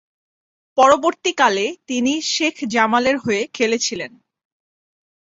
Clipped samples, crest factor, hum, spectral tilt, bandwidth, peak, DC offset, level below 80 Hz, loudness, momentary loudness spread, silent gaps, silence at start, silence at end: under 0.1%; 18 dB; none; -2.5 dB/octave; 8 kHz; -2 dBFS; under 0.1%; -60 dBFS; -18 LUFS; 9 LU; none; 0.75 s; 1.3 s